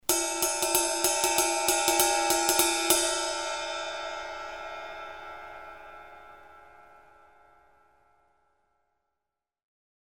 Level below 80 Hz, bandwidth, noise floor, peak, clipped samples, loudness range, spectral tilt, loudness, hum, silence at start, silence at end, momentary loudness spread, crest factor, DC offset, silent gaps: -58 dBFS; over 20 kHz; -88 dBFS; -4 dBFS; under 0.1%; 21 LU; 0 dB/octave; -25 LUFS; none; 0.1 s; 3.25 s; 20 LU; 26 dB; 0.2%; none